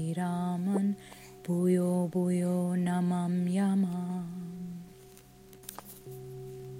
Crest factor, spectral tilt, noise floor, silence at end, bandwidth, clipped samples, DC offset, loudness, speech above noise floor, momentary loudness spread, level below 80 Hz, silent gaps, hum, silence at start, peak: 14 dB; -8 dB/octave; -54 dBFS; 0 s; 16 kHz; under 0.1%; under 0.1%; -31 LUFS; 25 dB; 18 LU; -68 dBFS; none; none; 0 s; -16 dBFS